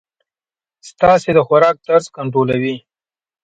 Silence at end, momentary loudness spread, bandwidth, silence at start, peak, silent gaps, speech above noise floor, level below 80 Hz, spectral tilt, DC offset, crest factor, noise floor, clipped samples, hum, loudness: 0.65 s; 9 LU; 9 kHz; 0.85 s; 0 dBFS; none; over 76 dB; -50 dBFS; -6.5 dB/octave; under 0.1%; 16 dB; under -90 dBFS; under 0.1%; none; -14 LUFS